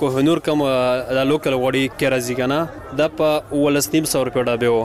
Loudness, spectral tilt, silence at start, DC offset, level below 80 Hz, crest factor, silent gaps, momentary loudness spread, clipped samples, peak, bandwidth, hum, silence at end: -19 LUFS; -5 dB/octave; 0 s; 0.2%; -48 dBFS; 12 dB; none; 3 LU; under 0.1%; -6 dBFS; 15.5 kHz; none; 0 s